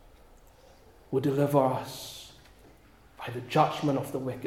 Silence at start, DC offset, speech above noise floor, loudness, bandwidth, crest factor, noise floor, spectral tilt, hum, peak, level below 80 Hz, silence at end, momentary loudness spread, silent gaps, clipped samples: 1.1 s; under 0.1%; 29 dB; -29 LUFS; 16.5 kHz; 22 dB; -57 dBFS; -6.5 dB/octave; none; -10 dBFS; -60 dBFS; 0 s; 17 LU; none; under 0.1%